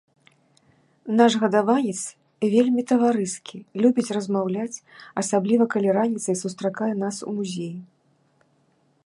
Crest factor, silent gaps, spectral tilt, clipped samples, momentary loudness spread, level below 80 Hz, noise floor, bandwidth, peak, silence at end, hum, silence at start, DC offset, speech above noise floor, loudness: 20 dB; none; -5 dB/octave; under 0.1%; 14 LU; -74 dBFS; -64 dBFS; 11.5 kHz; -4 dBFS; 1.2 s; none; 1.05 s; under 0.1%; 42 dB; -23 LUFS